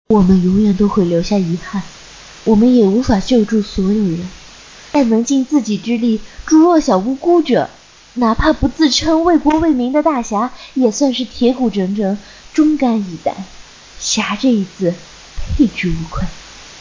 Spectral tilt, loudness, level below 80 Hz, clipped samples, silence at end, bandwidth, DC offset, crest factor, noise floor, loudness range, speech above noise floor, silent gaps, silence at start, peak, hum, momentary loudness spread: -5.5 dB/octave; -15 LUFS; -32 dBFS; under 0.1%; 0 s; 7.6 kHz; under 0.1%; 14 dB; -38 dBFS; 4 LU; 24 dB; none; 0.1 s; 0 dBFS; none; 14 LU